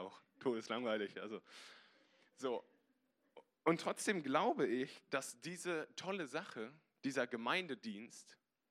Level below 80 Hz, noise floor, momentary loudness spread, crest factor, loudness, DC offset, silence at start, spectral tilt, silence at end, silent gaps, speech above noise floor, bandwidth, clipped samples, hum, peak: under -90 dBFS; -81 dBFS; 15 LU; 24 dB; -41 LUFS; under 0.1%; 0 s; -4 dB/octave; 0.35 s; none; 39 dB; 15 kHz; under 0.1%; none; -20 dBFS